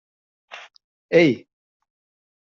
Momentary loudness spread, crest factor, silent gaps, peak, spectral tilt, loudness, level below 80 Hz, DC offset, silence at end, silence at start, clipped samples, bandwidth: 24 LU; 22 dB; 0.84-1.09 s; -4 dBFS; -5 dB/octave; -19 LUFS; -68 dBFS; under 0.1%; 1.1 s; 0.55 s; under 0.1%; 7.4 kHz